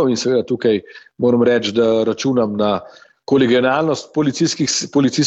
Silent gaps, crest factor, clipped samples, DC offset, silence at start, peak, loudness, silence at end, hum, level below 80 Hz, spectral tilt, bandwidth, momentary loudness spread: none; 14 dB; under 0.1%; under 0.1%; 0 s; -2 dBFS; -17 LUFS; 0 s; none; -58 dBFS; -4.5 dB/octave; 8.4 kHz; 5 LU